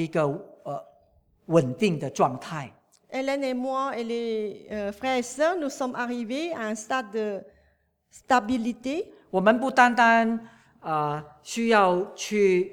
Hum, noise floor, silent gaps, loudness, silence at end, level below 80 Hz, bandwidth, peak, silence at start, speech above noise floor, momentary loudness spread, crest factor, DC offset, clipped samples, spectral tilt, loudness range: none; -67 dBFS; none; -25 LUFS; 0 s; -66 dBFS; 17 kHz; -4 dBFS; 0 s; 42 dB; 15 LU; 22 dB; under 0.1%; under 0.1%; -5 dB/octave; 6 LU